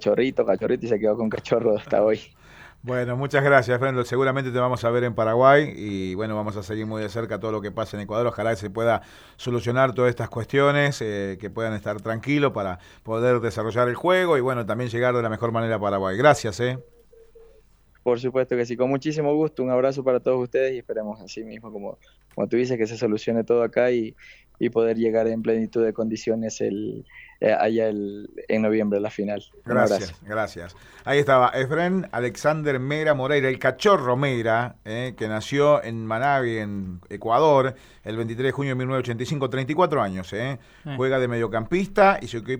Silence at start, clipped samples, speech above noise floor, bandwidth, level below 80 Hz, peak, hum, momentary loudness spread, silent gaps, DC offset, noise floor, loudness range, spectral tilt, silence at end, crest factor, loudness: 0 s; under 0.1%; 33 dB; 19.5 kHz; -54 dBFS; -2 dBFS; none; 12 LU; none; under 0.1%; -56 dBFS; 4 LU; -6.5 dB/octave; 0 s; 22 dB; -23 LUFS